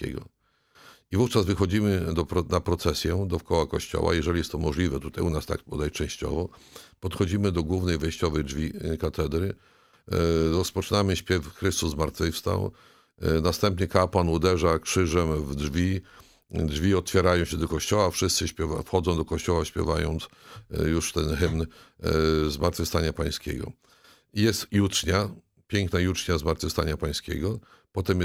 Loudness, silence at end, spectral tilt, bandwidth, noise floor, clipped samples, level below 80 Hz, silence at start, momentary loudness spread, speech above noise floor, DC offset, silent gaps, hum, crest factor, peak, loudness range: -27 LUFS; 0 s; -5 dB/octave; 16 kHz; -61 dBFS; under 0.1%; -38 dBFS; 0 s; 9 LU; 35 dB; under 0.1%; none; none; 22 dB; -4 dBFS; 3 LU